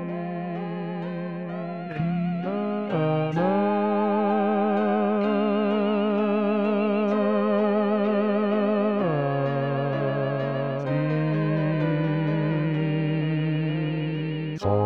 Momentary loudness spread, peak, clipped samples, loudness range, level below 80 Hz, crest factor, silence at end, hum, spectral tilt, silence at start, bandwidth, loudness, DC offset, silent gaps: 8 LU; -12 dBFS; under 0.1%; 3 LU; -64 dBFS; 12 dB; 0 s; none; -9.5 dB/octave; 0 s; 6 kHz; -25 LUFS; 0.2%; none